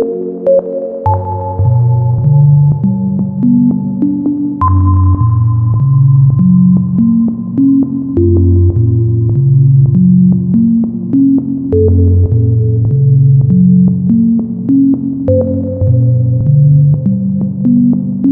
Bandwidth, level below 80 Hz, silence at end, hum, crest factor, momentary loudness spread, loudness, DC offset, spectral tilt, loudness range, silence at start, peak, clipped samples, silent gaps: 1.6 kHz; -32 dBFS; 0 s; none; 8 dB; 6 LU; -10 LUFS; under 0.1%; -16 dB/octave; 1 LU; 0 s; 0 dBFS; under 0.1%; none